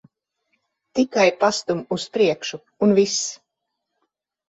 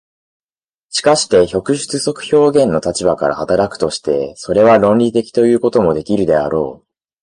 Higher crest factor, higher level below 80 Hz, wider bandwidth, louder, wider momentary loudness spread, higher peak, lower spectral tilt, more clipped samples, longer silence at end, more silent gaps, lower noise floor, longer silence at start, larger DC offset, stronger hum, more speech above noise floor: about the same, 18 dB vs 14 dB; second, -66 dBFS vs -46 dBFS; second, 8.2 kHz vs 11.5 kHz; second, -21 LUFS vs -14 LUFS; first, 11 LU vs 8 LU; second, -4 dBFS vs 0 dBFS; about the same, -4 dB/octave vs -5 dB/octave; neither; first, 1.15 s vs 0.45 s; neither; second, -79 dBFS vs under -90 dBFS; about the same, 0.95 s vs 0.9 s; neither; neither; second, 59 dB vs over 77 dB